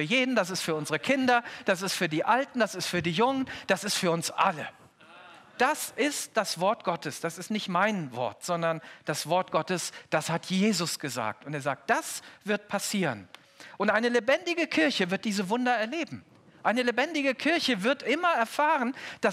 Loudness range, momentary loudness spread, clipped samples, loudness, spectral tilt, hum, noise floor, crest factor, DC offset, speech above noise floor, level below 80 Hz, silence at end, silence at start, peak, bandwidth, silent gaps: 3 LU; 8 LU; under 0.1%; -28 LUFS; -3.5 dB/octave; none; -52 dBFS; 18 dB; under 0.1%; 24 dB; -74 dBFS; 0 s; 0 s; -10 dBFS; 16 kHz; none